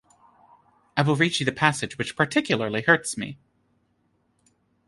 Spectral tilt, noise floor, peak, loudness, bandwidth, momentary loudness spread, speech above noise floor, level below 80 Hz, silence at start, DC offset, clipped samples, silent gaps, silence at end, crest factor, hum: -4.5 dB/octave; -69 dBFS; -2 dBFS; -23 LUFS; 11.5 kHz; 10 LU; 45 dB; -62 dBFS; 0.95 s; under 0.1%; under 0.1%; none; 1.55 s; 24 dB; none